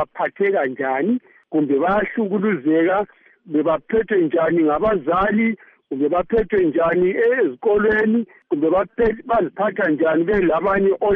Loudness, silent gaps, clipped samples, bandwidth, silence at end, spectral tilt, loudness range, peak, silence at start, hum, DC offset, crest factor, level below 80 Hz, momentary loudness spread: -19 LUFS; none; under 0.1%; 4.1 kHz; 0 s; -5.5 dB/octave; 2 LU; -8 dBFS; 0 s; none; under 0.1%; 10 dB; -46 dBFS; 5 LU